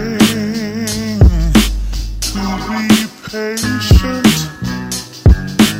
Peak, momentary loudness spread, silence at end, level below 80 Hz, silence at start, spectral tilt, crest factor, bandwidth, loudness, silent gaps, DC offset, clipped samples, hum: 0 dBFS; 10 LU; 0 s; -18 dBFS; 0 s; -5 dB/octave; 14 dB; 16.5 kHz; -14 LUFS; none; under 0.1%; under 0.1%; none